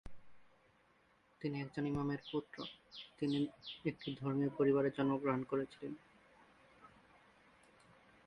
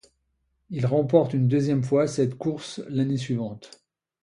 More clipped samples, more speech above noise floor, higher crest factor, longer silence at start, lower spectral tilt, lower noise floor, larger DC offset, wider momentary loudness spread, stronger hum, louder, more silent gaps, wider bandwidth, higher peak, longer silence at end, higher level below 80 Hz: neither; second, 33 dB vs 49 dB; about the same, 18 dB vs 20 dB; second, 0.05 s vs 0.7 s; about the same, -8 dB/octave vs -7.5 dB/octave; about the same, -72 dBFS vs -73 dBFS; neither; about the same, 15 LU vs 13 LU; neither; second, -39 LUFS vs -24 LUFS; neither; second, 9.8 kHz vs 11 kHz; second, -22 dBFS vs -6 dBFS; first, 1.4 s vs 0.55 s; second, -70 dBFS vs -60 dBFS